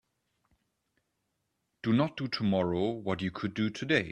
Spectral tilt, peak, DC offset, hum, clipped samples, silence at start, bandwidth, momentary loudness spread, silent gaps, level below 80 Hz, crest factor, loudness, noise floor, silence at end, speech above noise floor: -6.5 dB/octave; -12 dBFS; under 0.1%; none; under 0.1%; 1.85 s; 10 kHz; 5 LU; none; -66 dBFS; 20 dB; -31 LUFS; -81 dBFS; 0 s; 51 dB